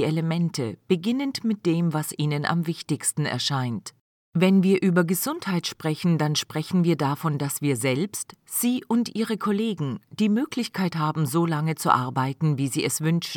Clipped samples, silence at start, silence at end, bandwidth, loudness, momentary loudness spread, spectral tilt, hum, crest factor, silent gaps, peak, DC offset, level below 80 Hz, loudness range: under 0.1%; 0 s; 0 s; 19 kHz; -24 LUFS; 6 LU; -5.5 dB/octave; none; 20 dB; 4.01-4.32 s; -4 dBFS; under 0.1%; -72 dBFS; 2 LU